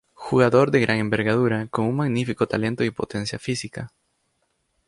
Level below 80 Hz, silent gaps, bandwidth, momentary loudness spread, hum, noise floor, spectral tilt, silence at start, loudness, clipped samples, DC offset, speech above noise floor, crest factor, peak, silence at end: -54 dBFS; none; 11.5 kHz; 11 LU; none; -71 dBFS; -6.5 dB/octave; 0.2 s; -22 LUFS; under 0.1%; under 0.1%; 50 dB; 20 dB; -4 dBFS; 1 s